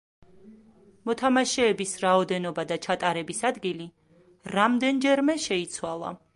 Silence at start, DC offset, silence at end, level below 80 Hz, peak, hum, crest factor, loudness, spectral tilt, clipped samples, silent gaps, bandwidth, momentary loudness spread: 0.45 s; under 0.1%; 0.2 s; -66 dBFS; -8 dBFS; none; 20 dB; -26 LUFS; -4 dB/octave; under 0.1%; none; 11.5 kHz; 11 LU